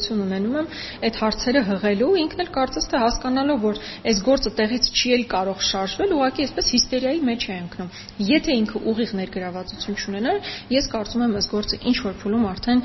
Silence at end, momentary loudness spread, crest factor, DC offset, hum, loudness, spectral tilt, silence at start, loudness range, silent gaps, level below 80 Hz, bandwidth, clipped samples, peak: 0 s; 9 LU; 18 dB; under 0.1%; none; -22 LUFS; -3 dB/octave; 0 s; 4 LU; none; -40 dBFS; 6.2 kHz; under 0.1%; -4 dBFS